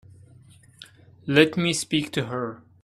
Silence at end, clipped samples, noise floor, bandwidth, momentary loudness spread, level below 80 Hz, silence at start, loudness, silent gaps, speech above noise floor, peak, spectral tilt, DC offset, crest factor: 0.25 s; under 0.1%; -52 dBFS; 14.5 kHz; 14 LU; -62 dBFS; 1.25 s; -23 LUFS; none; 29 dB; -2 dBFS; -4.5 dB/octave; under 0.1%; 24 dB